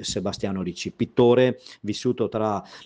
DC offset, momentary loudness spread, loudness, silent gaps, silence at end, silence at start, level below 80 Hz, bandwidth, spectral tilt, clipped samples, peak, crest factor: under 0.1%; 12 LU; -24 LUFS; none; 0 s; 0 s; -56 dBFS; 9.8 kHz; -5.5 dB/octave; under 0.1%; -6 dBFS; 16 dB